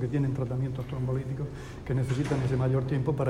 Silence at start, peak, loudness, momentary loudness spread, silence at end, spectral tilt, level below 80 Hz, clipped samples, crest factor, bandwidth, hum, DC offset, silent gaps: 0 s; -14 dBFS; -30 LUFS; 8 LU; 0 s; -8.5 dB/octave; -46 dBFS; under 0.1%; 14 dB; 10.5 kHz; none; under 0.1%; none